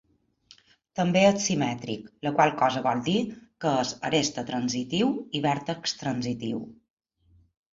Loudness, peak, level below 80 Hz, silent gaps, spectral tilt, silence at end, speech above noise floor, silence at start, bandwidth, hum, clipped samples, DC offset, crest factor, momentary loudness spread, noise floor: -26 LUFS; -6 dBFS; -62 dBFS; none; -4.5 dB/octave; 1 s; 36 dB; 0.95 s; 7.8 kHz; none; under 0.1%; under 0.1%; 20 dB; 12 LU; -62 dBFS